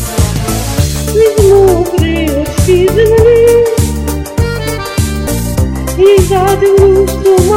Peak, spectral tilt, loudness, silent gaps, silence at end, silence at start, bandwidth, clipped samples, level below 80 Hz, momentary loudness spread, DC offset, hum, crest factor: 0 dBFS; -6 dB/octave; -9 LUFS; none; 0 s; 0 s; 16.5 kHz; 0.6%; -20 dBFS; 9 LU; under 0.1%; none; 8 dB